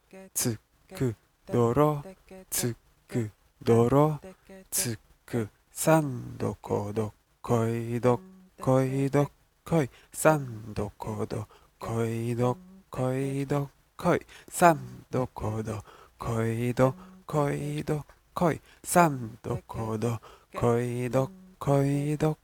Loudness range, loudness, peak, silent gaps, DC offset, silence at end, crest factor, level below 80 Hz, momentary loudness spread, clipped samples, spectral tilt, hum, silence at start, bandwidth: 3 LU; -29 LUFS; -4 dBFS; none; under 0.1%; 0.1 s; 24 dB; -54 dBFS; 14 LU; under 0.1%; -6 dB/octave; none; 0.15 s; 18.5 kHz